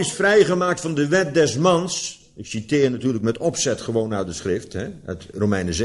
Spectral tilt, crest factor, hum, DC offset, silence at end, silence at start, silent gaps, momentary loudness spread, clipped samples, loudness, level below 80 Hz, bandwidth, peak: -4.5 dB/octave; 18 dB; none; under 0.1%; 0 s; 0 s; none; 14 LU; under 0.1%; -21 LUFS; -48 dBFS; 11.5 kHz; -4 dBFS